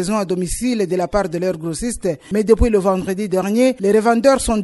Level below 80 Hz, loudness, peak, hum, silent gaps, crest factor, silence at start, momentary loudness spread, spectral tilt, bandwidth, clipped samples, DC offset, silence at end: -32 dBFS; -17 LUFS; 0 dBFS; none; none; 16 dB; 0 s; 8 LU; -5.5 dB/octave; 12 kHz; under 0.1%; under 0.1%; 0 s